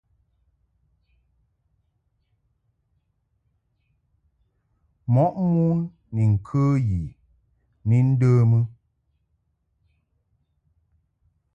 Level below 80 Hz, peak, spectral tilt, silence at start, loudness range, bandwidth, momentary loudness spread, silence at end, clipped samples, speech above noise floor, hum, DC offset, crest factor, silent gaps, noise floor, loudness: -48 dBFS; -10 dBFS; -10.5 dB/octave; 5.1 s; 5 LU; 7.2 kHz; 12 LU; 2.85 s; under 0.1%; 52 dB; none; under 0.1%; 16 dB; none; -71 dBFS; -22 LUFS